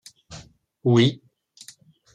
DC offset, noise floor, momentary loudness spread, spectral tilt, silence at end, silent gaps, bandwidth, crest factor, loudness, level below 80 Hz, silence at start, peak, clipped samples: under 0.1%; -51 dBFS; 26 LU; -6.5 dB/octave; 1 s; none; 11 kHz; 20 dB; -21 LUFS; -62 dBFS; 0.3 s; -6 dBFS; under 0.1%